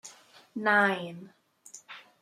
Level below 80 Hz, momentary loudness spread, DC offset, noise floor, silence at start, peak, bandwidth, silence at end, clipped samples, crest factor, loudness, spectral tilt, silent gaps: -84 dBFS; 25 LU; under 0.1%; -54 dBFS; 0.05 s; -10 dBFS; 15.5 kHz; 0.2 s; under 0.1%; 22 dB; -26 LUFS; -4 dB/octave; none